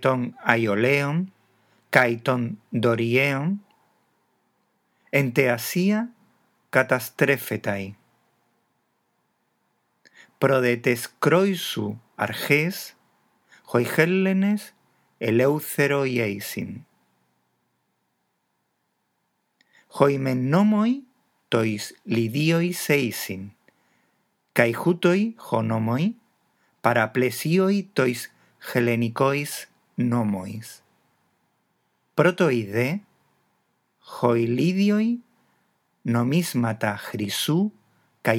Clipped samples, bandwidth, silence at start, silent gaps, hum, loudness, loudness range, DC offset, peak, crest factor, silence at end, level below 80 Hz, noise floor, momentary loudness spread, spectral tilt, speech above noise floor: under 0.1%; 19.5 kHz; 0 s; none; none; -23 LUFS; 4 LU; under 0.1%; 0 dBFS; 24 dB; 0 s; -78 dBFS; -74 dBFS; 12 LU; -6 dB/octave; 52 dB